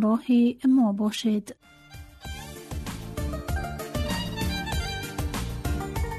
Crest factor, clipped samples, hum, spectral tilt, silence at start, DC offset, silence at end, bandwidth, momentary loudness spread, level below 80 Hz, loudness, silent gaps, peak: 14 dB; under 0.1%; none; -5.5 dB/octave; 0 s; under 0.1%; 0 s; 13.5 kHz; 18 LU; -36 dBFS; -27 LUFS; none; -14 dBFS